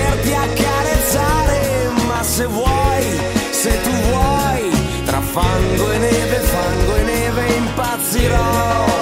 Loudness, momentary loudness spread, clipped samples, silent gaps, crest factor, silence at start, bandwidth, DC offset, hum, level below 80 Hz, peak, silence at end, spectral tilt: -16 LUFS; 3 LU; under 0.1%; none; 14 dB; 0 s; 16.5 kHz; under 0.1%; none; -24 dBFS; -2 dBFS; 0 s; -4.5 dB/octave